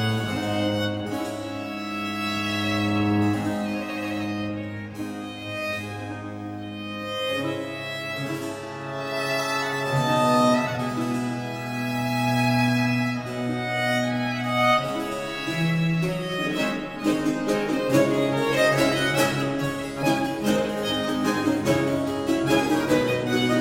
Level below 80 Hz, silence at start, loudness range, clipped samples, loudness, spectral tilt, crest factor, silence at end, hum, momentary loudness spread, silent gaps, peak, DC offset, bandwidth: -54 dBFS; 0 s; 8 LU; under 0.1%; -25 LUFS; -5.5 dB/octave; 18 dB; 0 s; none; 10 LU; none; -8 dBFS; under 0.1%; 17 kHz